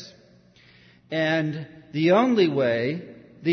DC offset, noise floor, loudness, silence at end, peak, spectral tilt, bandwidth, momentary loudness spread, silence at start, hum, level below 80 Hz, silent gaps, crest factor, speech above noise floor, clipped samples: under 0.1%; -55 dBFS; -23 LUFS; 0 s; -6 dBFS; -7 dB/octave; 6.4 kHz; 14 LU; 0 s; none; -68 dBFS; none; 18 dB; 32 dB; under 0.1%